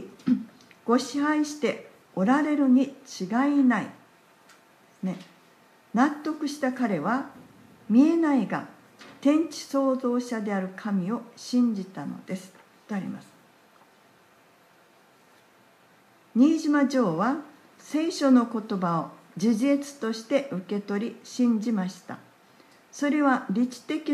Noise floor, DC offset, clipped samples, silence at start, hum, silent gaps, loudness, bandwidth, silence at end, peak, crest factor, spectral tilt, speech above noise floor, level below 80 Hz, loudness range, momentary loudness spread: -58 dBFS; under 0.1%; under 0.1%; 0 s; none; none; -26 LUFS; 13 kHz; 0 s; -8 dBFS; 18 dB; -6 dB/octave; 34 dB; -80 dBFS; 7 LU; 15 LU